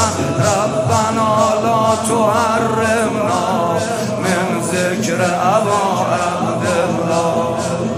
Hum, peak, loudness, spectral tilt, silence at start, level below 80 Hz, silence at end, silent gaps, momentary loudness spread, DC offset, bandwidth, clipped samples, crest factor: none; 0 dBFS; -16 LUFS; -5 dB/octave; 0 s; -52 dBFS; 0 s; none; 4 LU; under 0.1%; 15.5 kHz; under 0.1%; 14 dB